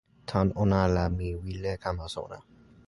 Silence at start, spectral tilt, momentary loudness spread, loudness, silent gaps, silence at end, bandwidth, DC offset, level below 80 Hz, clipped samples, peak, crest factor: 0.3 s; -7.5 dB/octave; 13 LU; -29 LUFS; none; 0.45 s; 11.5 kHz; under 0.1%; -40 dBFS; under 0.1%; -10 dBFS; 20 dB